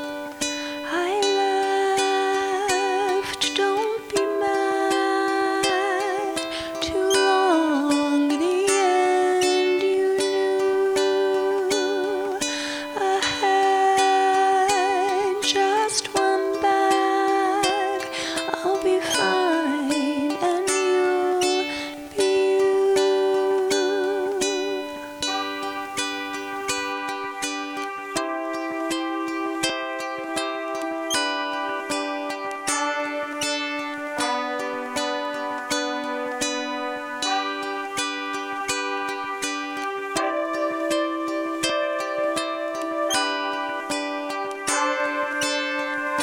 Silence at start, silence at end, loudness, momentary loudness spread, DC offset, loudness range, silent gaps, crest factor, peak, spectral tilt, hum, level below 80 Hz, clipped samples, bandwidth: 0 s; 0 s; -23 LUFS; 8 LU; under 0.1%; 6 LU; none; 16 dB; -6 dBFS; -2 dB/octave; none; -62 dBFS; under 0.1%; 18.5 kHz